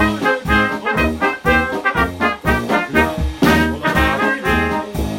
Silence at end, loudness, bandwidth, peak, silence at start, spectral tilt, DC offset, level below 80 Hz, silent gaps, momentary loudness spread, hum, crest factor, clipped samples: 0 s; -16 LUFS; 16.5 kHz; -2 dBFS; 0 s; -5.5 dB/octave; under 0.1%; -28 dBFS; none; 3 LU; none; 14 dB; under 0.1%